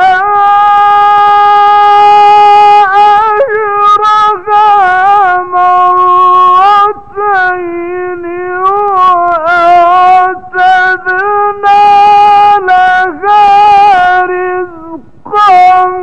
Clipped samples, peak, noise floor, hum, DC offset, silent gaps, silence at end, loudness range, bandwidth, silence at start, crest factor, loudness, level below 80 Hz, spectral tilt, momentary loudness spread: 3%; 0 dBFS; -26 dBFS; none; 2%; none; 0 s; 4 LU; 8.6 kHz; 0 s; 6 dB; -5 LUFS; -44 dBFS; -4 dB/octave; 8 LU